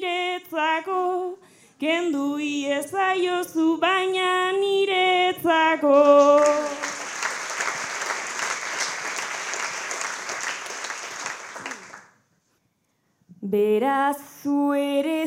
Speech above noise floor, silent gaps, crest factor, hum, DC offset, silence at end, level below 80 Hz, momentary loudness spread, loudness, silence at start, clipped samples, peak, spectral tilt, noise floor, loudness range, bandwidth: 47 dB; none; 18 dB; none; under 0.1%; 0 s; -80 dBFS; 13 LU; -23 LUFS; 0 s; under 0.1%; -6 dBFS; -2.5 dB/octave; -70 dBFS; 12 LU; 16.5 kHz